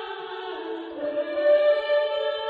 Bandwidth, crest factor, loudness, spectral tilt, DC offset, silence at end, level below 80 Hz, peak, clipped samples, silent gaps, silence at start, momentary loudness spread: 4.9 kHz; 14 dB; -25 LUFS; -4.5 dB/octave; under 0.1%; 0 s; -70 dBFS; -10 dBFS; under 0.1%; none; 0 s; 14 LU